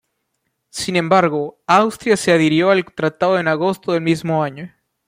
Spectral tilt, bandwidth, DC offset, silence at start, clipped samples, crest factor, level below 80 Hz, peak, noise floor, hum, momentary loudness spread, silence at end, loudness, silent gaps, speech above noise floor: -5.5 dB/octave; 15.5 kHz; under 0.1%; 0.75 s; under 0.1%; 16 dB; -58 dBFS; -2 dBFS; -72 dBFS; none; 11 LU; 0.4 s; -17 LUFS; none; 55 dB